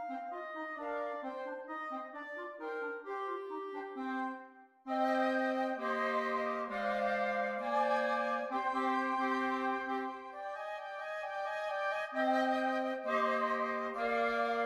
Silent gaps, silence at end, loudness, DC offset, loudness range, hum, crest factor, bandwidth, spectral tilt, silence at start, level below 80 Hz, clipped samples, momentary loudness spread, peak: none; 0 s; -36 LUFS; under 0.1%; 7 LU; none; 16 dB; 12.5 kHz; -4.5 dB/octave; 0 s; -76 dBFS; under 0.1%; 10 LU; -20 dBFS